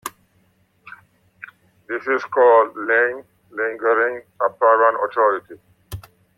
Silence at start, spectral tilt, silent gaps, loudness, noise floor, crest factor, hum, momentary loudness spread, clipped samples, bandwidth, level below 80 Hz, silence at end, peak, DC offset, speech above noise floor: 0.05 s; -5 dB/octave; none; -18 LUFS; -61 dBFS; 18 dB; none; 22 LU; under 0.1%; 15.5 kHz; -58 dBFS; 0.35 s; -4 dBFS; under 0.1%; 43 dB